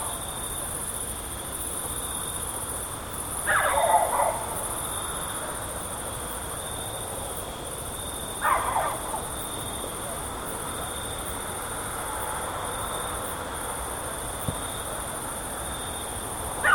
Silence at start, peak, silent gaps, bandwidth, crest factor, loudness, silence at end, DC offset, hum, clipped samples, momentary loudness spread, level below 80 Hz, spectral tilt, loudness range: 0 s; -8 dBFS; none; 19 kHz; 22 dB; -29 LUFS; 0 s; under 0.1%; none; under 0.1%; 7 LU; -44 dBFS; -2 dB/octave; 5 LU